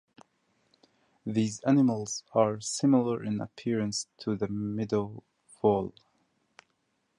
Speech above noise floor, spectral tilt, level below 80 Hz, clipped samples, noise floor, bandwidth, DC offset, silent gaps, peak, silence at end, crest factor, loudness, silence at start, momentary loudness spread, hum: 48 dB; -6 dB/octave; -64 dBFS; under 0.1%; -76 dBFS; 11.5 kHz; under 0.1%; none; -10 dBFS; 1.3 s; 20 dB; -29 LUFS; 1.25 s; 10 LU; none